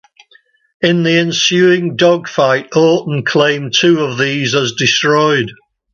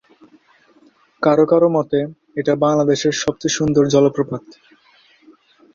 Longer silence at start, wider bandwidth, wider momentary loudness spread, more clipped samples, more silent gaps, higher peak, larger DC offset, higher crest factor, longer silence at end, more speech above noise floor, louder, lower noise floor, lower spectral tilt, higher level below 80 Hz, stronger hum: second, 0.8 s vs 1.2 s; about the same, 7.4 kHz vs 7.6 kHz; second, 4 LU vs 10 LU; neither; neither; about the same, 0 dBFS vs -2 dBFS; neither; about the same, 12 dB vs 16 dB; second, 0.4 s vs 1.25 s; about the same, 38 dB vs 37 dB; first, -12 LUFS vs -17 LUFS; about the same, -51 dBFS vs -53 dBFS; about the same, -4.5 dB/octave vs -5.5 dB/octave; about the same, -56 dBFS vs -54 dBFS; neither